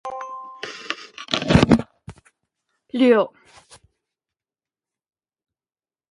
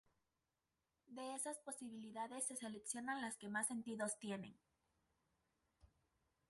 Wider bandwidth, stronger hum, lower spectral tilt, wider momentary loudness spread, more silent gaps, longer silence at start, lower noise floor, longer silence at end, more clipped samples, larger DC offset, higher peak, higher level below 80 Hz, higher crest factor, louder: about the same, 11.5 kHz vs 12 kHz; neither; first, -6 dB/octave vs -3 dB/octave; first, 18 LU vs 9 LU; neither; second, 0.05 s vs 1.1 s; about the same, under -90 dBFS vs under -90 dBFS; first, 2.85 s vs 0.65 s; neither; neither; first, 0 dBFS vs -28 dBFS; first, -42 dBFS vs -86 dBFS; about the same, 24 dB vs 22 dB; first, -20 LUFS vs -47 LUFS